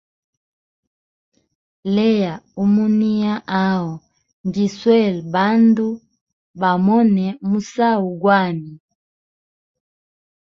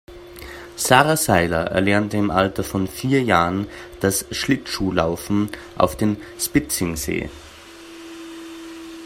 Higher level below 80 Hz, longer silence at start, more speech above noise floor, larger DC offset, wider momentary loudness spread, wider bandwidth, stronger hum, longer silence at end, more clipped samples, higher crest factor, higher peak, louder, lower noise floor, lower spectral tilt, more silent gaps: second, -60 dBFS vs -44 dBFS; first, 1.85 s vs 0.1 s; first, over 73 dB vs 21 dB; neither; second, 12 LU vs 20 LU; second, 7.2 kHz vs 16 kHz; neither; first, 1.7 s vs 0 s; neither; about the same, 18 dB vs 22 dB; about the same, -2 dBFS vs 0 dBFS; first, -17 LUFS vs -20 LUFS; first, under -90 dBFS vs -41 dBFS; first, -7.5 dB/octave vs -4.5 dB/octave; first, 4.33-4.44 s, 6.21-6.27 s, 6.33-6.54 s vs none